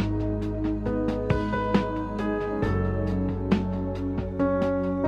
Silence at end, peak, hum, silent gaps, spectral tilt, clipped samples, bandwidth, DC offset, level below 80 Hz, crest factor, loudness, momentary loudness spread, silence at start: 0 s; -8 dBFS; none; none; -9 dB/octave; under 0.1%; 8 kHz; under 0.1%; -36 dBFS; 16 dB; -27 LUFS; 5 LU; 0 s